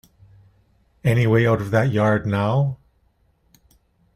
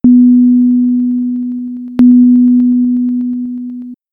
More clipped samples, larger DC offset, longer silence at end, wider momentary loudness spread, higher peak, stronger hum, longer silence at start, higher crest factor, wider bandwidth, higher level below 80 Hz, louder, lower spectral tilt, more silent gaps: neither; neither; first, 1.4 s vs 0.2 s; second, 8 LU vs 15 LU; second, -4 dBFS vs 0 dBFS; neither; first, 1.05 s vs 0.05 s; first, 18 dB vs 10 dB; first, 14.5 kHz vs 1.6 kHz; about the same, -50 dBFS vs -46 dBFS; second, -20 LUFS vs -10 LUFS; second, -8 dB/octave vs -10.5 dB/octave; neither